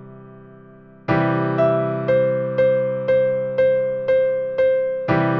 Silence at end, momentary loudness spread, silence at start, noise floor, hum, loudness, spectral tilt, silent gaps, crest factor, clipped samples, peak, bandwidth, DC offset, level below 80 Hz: 0 s; 3 LU; 0 s; -45 dBFS; none; -19 LUFS; -9.5 dB/octave; none; 12 dB; under 0.1%; -6 dBFS; 5.4 kHz; under 0.1%; -54 dBFS